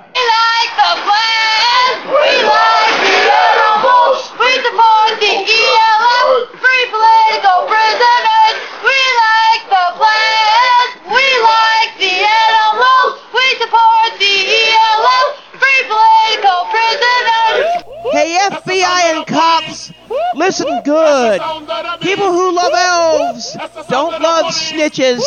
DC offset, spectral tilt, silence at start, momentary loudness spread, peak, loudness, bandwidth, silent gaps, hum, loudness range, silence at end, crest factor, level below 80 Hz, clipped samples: 0.4%; -1.5 dB/octave; 0.15 s; 7 LU; 0 dBFS; -10 LUFS; 9 kHz; none; none; 4 LU; 0 s; 12 dB; -60 dBFS; under 0.1%